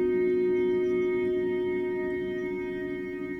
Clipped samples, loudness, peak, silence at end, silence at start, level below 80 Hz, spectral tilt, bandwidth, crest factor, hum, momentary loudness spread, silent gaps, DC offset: under 0.1%; -28 LUFS; -18 dBFS; 0 s; 0 s; -56 dBFS; -8 dB/octave; 4.3 kHz; 10 dB; none; 8 LU; none; under 0.1%